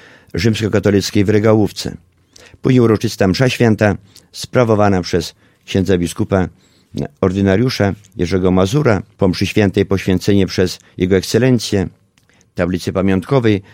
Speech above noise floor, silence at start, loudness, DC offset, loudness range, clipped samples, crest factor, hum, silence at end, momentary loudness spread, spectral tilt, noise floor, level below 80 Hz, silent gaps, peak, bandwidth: 39 dB; 0.35 s; -15 LUFS; under 0.1%; 2 LU; under 0.1%; 16 dB; none; 0.15 s; 11 LU; -6.5 dB/octave; -54 dBFS; -42 dBFS; none; 0 dBFS; 16.5 kHz